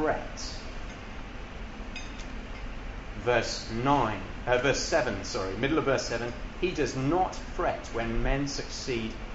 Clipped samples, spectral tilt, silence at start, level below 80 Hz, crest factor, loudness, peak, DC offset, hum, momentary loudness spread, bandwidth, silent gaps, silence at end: under 0.1%; -4.5 dB/octave; 0 s; -40 dBFS; 20 dB; -30 LUFS; -10 dBFS; under 0.1%; none; 15 LU; 8 kHz; none; 0 s